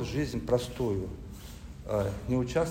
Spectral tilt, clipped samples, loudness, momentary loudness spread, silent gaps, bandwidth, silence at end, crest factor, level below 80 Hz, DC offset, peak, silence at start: -6.5 dB/octave; under 0.1%; -31 LUFS; 16 LU; none; 16 kHz; 0 s; 18 dB; -44 dBFS; under 0.1%; -12 dBFS; 0 s